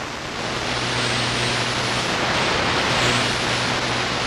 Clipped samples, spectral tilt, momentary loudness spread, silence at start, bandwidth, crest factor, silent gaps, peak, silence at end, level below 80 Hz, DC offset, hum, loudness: under 0.1%; -3 dB/octave; 5 LU; 0 s; 15.5 kHz; 14 dB; none; -8 dBFS; 0 s; -42 dBFS; under 0.1%; none; -20 LUFS